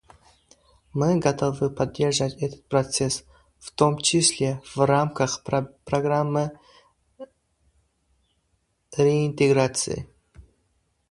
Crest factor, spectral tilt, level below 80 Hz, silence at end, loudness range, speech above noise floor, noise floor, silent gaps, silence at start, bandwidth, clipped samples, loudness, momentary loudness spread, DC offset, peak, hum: 22 dB; -4.5 dB/octave; -54 dBFS; 0.7 s; 6 LU; 48 dB; -71 dBFS; none; 0.95 s; 11.5 kHz; under 0.1%; -23 LUFS; 12 LU; under 0.1%; -2 dBFS; none